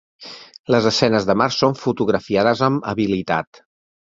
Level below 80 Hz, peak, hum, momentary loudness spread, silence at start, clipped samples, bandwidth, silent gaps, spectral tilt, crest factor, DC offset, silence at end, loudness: -52 dBFS; -2 dBFS; none; 19 LU; 0.2 s; under 0.1%; 7.8 kHz; 0.59-0.64 s; -5.5 dB/octave; 18 dB; under 0.1%; 0.7 s; -18 LUFS